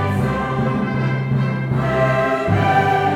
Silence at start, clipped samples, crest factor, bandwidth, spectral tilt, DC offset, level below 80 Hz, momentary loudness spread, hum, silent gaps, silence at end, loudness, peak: 0 s; under 0.1%; 14 dB; 10.5 kHz; -8 dB/octave; under 0.1%; -40 dBFS; 5 LU; none; none; 0 s; -18 LUFS; -4 dBFS